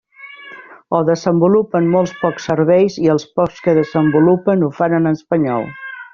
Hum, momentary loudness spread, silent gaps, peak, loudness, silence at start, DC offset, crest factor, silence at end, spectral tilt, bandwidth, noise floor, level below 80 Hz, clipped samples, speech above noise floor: none; 12 LU; none; -2 dBFS; -15 LUFS; 0.2 s; under 0.1%; 14 dB; 0.1 s; -7 dB/octave; 7.2 kHz; -37 dBFS; -54 dBFS; under 0.1%; 23 dB